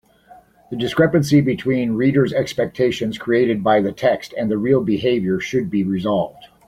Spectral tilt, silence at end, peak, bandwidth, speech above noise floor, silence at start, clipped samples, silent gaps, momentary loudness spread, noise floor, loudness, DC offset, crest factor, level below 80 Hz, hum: -7 dB/octave; 0.25 s; -2 dBFS; 15.5 kHz; 30 dB; 0.7 s; under 0.1%; none; 6 LU; -48 dBFS; -19 LUFS; under 0.1%; 16 dB; -52 dBFS; none